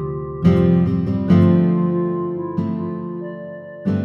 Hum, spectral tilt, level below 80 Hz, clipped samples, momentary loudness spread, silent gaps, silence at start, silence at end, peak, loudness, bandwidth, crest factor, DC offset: none; -10.5 dB/octave; -44 dBFS; under 0.1%; 15 LU; none; 0 s; 0 s; -2 dBFS; -18 LUFS; 5.6 kHz; 16 dB; under 0.1%